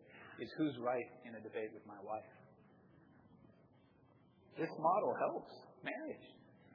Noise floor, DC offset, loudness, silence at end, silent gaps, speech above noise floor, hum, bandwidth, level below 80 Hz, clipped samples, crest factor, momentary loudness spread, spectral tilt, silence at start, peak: -68 dBFS; under 0.1%; -42 LUFS; 0 s; none; 27 dB; none; 5.4 kHz; -86 dBFS; under 0.1%; 22 dB; 20 LU; -4.5 dB/octave; 0 s; -22 dBFS